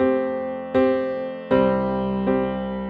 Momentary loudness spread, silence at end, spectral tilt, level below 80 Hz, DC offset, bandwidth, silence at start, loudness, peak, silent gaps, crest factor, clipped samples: 7 LU; 0 s; -9.5 dB/octave; -46 dBFS; under 0.1%; 5 kHz; 0 s; -22 LUFS; -6 dBFS; none; 16 dB; under 0.1%